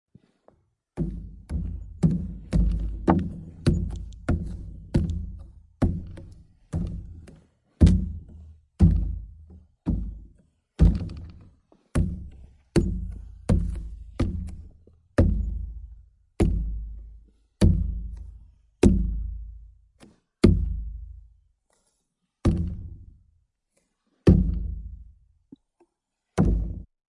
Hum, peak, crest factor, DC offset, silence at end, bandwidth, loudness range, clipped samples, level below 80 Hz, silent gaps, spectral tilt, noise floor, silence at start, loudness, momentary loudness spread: none; -2 dBFS; 24 dB; under 0.1%; 0.25 s; 11.5 kHz; 4 LU; under 0.1%; -32 dBFS; none; -8.5 dB/octave; -80 dBFS; 0.95 s; -26 LUFS; 21 LU